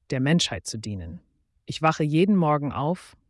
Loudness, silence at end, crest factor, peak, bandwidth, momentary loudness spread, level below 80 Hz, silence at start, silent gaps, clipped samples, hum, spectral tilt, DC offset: -24 LUFS; 0.2 s; 16 dB; -8 dBFS; 12 kHz; 15 LU; -56 dBFS; 0.1 s; none; under 0.1%; none; -5.5 dB/octave; under 0.1%